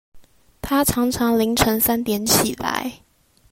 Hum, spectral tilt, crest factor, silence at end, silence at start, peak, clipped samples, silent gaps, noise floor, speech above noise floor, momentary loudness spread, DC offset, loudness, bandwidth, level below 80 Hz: none; -3.5 dB/octave; 20 dB; 0.55 s; 0.15 s; -2 dBFS; under 0.1%; none; -42 dBFS; 23 dB; 9 LU; under 0.1%; -19 LUFS; 16.5 kHz; -42 dBFS